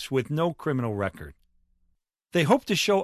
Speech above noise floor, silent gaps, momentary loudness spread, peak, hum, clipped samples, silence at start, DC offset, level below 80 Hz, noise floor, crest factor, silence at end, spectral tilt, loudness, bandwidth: 46 dB; none; 11 LU; -6 dBFS; none; under 0.1%; 0 s; under 0.1%; -54 dBFS; -71 dBFS; 20 dB; 0 s; -5 dB/octave; -26 LUFS; 14 kHz